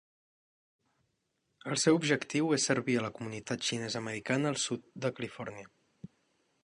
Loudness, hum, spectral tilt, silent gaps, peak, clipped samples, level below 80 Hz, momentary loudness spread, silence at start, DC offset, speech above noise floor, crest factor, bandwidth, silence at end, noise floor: -32 LUFS; none; -4 dB/octave; none; -14 dBFS; under 0.1%; -74 dBFS; 14 LU; 1.65 s; under 0.1%; 48 dB; 22 dB; 11.5 kHz; 0.6 s; -80 dBFS